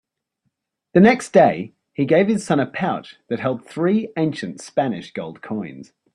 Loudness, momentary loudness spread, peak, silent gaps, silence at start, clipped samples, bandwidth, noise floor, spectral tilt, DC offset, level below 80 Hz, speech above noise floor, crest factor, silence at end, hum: -20 LUFS; 15 LU; -2 dBFS; none; 0.95 s; under 0.1%; 11 kHz; -74 dBFS; -6.5 dB/octave; under 0.1%; -60 dBFS; 55 dB; 18 dB; 0.3 s; none